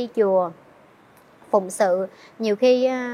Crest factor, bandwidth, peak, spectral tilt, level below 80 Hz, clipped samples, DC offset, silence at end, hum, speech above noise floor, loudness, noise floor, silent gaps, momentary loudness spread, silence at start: 16 dB; 14.5 kHz; -6 dBFS; -5 dB/octave; -74 dBFS; under 0.1%; under 0.1%; 0 s; none; 31 dB; -21 LUFS; -52 dBFS; none; 10 LU; 0 s